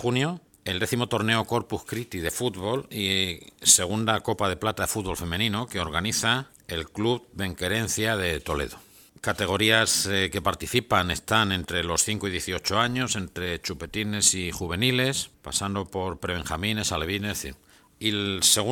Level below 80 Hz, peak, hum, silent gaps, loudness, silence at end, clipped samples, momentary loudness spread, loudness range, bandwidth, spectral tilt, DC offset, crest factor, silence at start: -48 dBFS; -4 dBFS; none; none; -25 LUFS; 0 s; under 0.1%; 11 LU; 4 LU; 19 kHz; -3 dB/octave; under 0.1%; 24 dB; 0 s